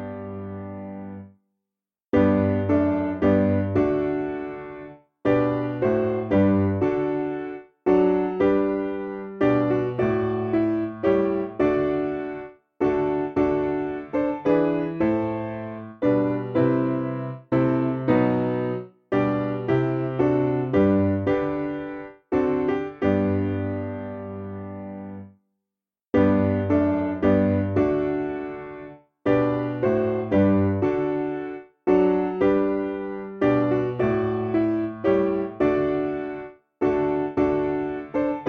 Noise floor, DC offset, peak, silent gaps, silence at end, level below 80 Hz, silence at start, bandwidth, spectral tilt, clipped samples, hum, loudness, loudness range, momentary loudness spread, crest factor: -88 dBFS; under 0.1%; -6 dBFS; none; 0 s; -52 dBFS; 0 s; 6.2 kHz; -10 dB/octave; under 0.1%; none; -23 LUFS; 2 LU; 14 LU; 16 dB